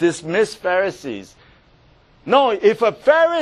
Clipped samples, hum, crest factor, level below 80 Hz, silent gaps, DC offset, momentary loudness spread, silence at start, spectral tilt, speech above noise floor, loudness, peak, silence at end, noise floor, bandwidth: under 0.1%; none; 18 dB; -58 dBFS; none; under 0.1%; 16 LU; 0 s; -4.5 dB/octave; 35 dB; -17 LUFS; 0 dBFS; 0 s; -52 dBFS; 12 kHz